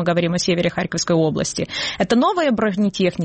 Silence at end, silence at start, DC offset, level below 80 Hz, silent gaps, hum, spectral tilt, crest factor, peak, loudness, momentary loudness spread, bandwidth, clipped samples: 0 s; 0 s; under 0.1%; -50 dBFS; none; none; -5 dB/octave; 12 dB; -6 dBFS; -19 LUFS; 6 LU; 8.8 kHz; under 0.1%